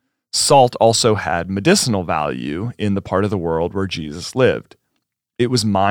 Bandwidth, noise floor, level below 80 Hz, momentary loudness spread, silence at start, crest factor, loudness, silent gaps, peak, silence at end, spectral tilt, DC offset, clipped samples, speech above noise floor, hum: 19.5 kHz; -74 dBFS; -50 dBFS; 11 LU; 0.35 s; 16 dB; -17 LUFS; none; -2 dBFS; 0 s; -4.5 dB/octave; under 0.1%; under 0.1%; 57 dB; none